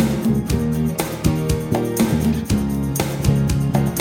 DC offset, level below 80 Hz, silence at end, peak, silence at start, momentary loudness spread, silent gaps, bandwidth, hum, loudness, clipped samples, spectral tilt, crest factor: under 0.1%; -30 dBFS; 0 s; -2 dBFS; 0 s; 3 LU; none; 17.5 kHz; none; -20 LUFS; under 0.1%; -6.5 dB/octave; 16 dB